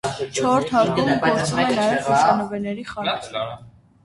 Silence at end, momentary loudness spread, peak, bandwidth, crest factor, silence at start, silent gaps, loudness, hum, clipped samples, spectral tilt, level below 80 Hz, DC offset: 0.35 s; 11 LU; -4 dBFS; 11.5 kHz; 18 dB; 0.05 s; none; -20 LUFS; none; under 0.1%; -4.5 dB/octave; -54 dBFS; under 0.1%